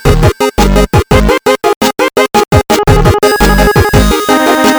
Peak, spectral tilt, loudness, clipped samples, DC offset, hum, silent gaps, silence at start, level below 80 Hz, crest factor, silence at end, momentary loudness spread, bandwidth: 0 dBFS; -5 dB/octave; -8 LUFS; 2%; under 0.1%; none; 1.76-1.81 s; 0.05 s; -16 dBFS; 8 dB; 0 s; 3 LU; over 20 kHz